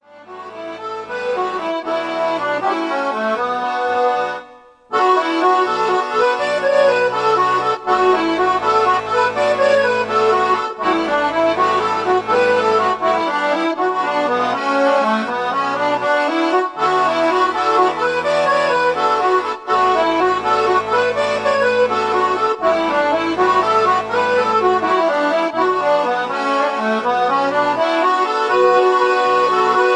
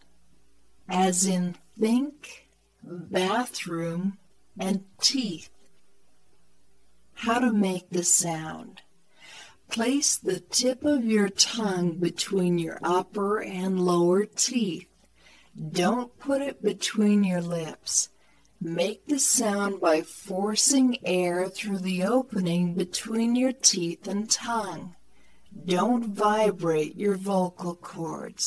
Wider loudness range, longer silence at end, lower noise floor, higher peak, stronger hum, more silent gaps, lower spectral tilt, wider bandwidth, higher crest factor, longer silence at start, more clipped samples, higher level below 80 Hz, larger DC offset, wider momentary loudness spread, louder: about the same, 3 LU vs 4 LU; about the same, 0 s vs 0 s; second, -43 dBFS vs -67 dBFS; about the same, -2 dBFS vs -4 dBFS; neither; neither; about the same, -4 dB/octave vs -3.5 dB/octave; about the same, 10.5 kHz vs 11 kHz; second, 14 dB vs 22 dB; second, 0.15 s vs 0.9 s; neither; first, -56 dBFS vs -68 dBFS; neither; second, 5 LU vs 13 LU; first, -16 LUFS vs -26 LUFS